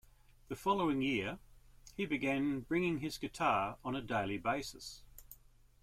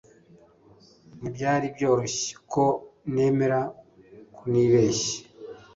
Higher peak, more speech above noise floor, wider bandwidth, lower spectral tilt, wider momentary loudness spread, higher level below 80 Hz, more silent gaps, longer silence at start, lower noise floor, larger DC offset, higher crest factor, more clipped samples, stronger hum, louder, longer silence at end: second, -20 dBFS vs -10 dBFS; second, 27 dB vs 32 dB; first, 16 kHz vs 8 kHz; about the same, -5.5 dB/octave vs -5 dB/octave; about the same, 17 LU vs 16 LU; about the same, -60 dBFS vs -60 dBFS; neither; second, 0.5 s vs 1.15 s; first, -63 dBFS vs -55 dBFS; neither; about the same, 18 dB vs 16 dB; neither; neither; second, -36 LUFS vs -25 LUFS; first, 0.5 s vs 0.2 s